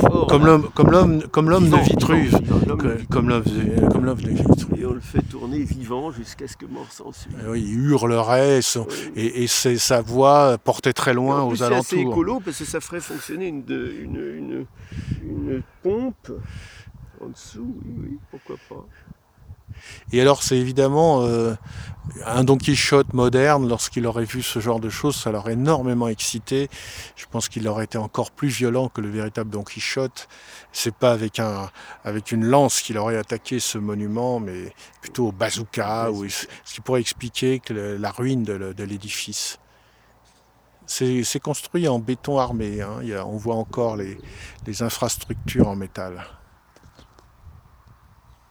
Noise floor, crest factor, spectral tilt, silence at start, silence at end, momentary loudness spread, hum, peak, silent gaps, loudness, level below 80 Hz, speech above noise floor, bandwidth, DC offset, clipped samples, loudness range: -57 dBFS; 22 dB; -5.5 dB/octave; 0 s; 1 s; 19 LU; none; 0 dBFS; none; -21 LUFS; -42 dBFS; 35 dB; over 20 kHz; under 0.1%; under 0.1%; 11 LU